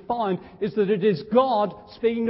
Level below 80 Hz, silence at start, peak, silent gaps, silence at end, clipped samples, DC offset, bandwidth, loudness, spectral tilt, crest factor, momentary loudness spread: -60 dBFS; 0.1 s; -6 dBFS; none; 0 s; under 0.1%; under 0.1%; 5.8 kHz; -23 LUFS; -11 dB/octave; 16 dB; 8 LU